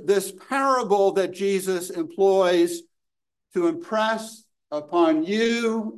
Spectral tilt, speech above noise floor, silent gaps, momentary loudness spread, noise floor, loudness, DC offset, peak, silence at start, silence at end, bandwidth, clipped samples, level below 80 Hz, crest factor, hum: -4.5 dB/octave; 65 dB; none; 11 LU; -87 dBFS; -23 LUFS; under 0.1%; -6 dBFS; 0 s; 0 s; 12.5 kHz; under 0.1%; -74 dBFS; 16 dB; none